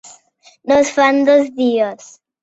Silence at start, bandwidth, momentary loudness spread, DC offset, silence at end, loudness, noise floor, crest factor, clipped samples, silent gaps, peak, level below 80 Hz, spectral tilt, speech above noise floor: 0.65 s; 8.2 kHz; 9 LU; under 0.1%; 0.5 s; -14 LUFS; -50 dBFS; 14 dB; under 0.1%; none; -2 dBFS; -58 dBFS; -3.5 dB/octave; 36 dB